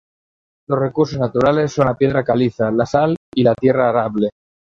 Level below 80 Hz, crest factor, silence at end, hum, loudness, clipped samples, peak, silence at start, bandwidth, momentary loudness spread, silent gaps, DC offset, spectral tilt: -48 dBFS; 16 dB; 0.4 s; none; -17 LUFS; under 0.1%; -2 dBFS; 0.7 s; 7.6 kHz; 5 LU; 3.17-3.32 s; under 0.1%; -7.5 dB/octave